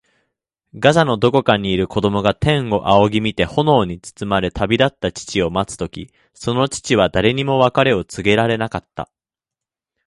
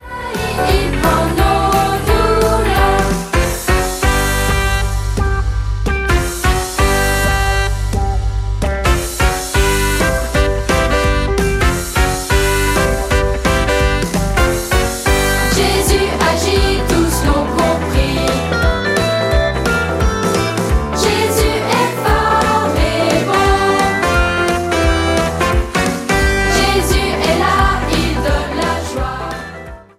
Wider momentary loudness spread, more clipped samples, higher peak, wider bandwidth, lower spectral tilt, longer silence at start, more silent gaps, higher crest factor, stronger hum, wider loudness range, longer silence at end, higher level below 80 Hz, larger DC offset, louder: first, 12 LU vs 5 LU; neither; about the same, 0 dBFS vs 0 dBFS; second, 11.5 kHz vs 16 kHz; about the same, -5.5 dB/octave vs -4.5 dB/octave; first, 0.75 s vs 0 s; neither; about the same, 18 dB vs 14 dB; neither; about the same, 3 LU vs 2 LU; first, 1 s vs 0.15 s; second, -40 dBFS vs -20 dBFS; neither; about the same, -17 LUFS vs -15 LUFS